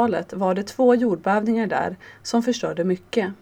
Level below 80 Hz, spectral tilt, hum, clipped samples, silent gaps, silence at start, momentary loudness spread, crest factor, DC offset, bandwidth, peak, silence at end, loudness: -60 dBFS; -6 dB/octave; none; under 0.1%; none; 0 s; 7 LU; 16 dB; under 0.1%; 15.5 kHz; -6 dBFS; 0.05 s; -22 LUFS